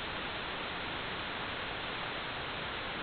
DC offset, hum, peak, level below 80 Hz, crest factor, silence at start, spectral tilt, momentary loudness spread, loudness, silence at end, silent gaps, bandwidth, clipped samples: under 0.1%; none; -26 dBFS; -56 dBFS; 12 dB; 0 s; -1 dB/octave; 0 LU; -37 LUFS; 0 s; none; 4.9 kHz; under 0.1%